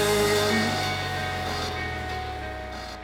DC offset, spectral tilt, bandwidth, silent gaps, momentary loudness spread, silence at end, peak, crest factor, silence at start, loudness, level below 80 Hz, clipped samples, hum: under 0.1%; -4 dB/octave; over 20 kHz; none; 13 LU; 0 s; -12 dBFS; 16 dB; 0 s; -27 LUFS; -42 dBFS; under 0.1%; none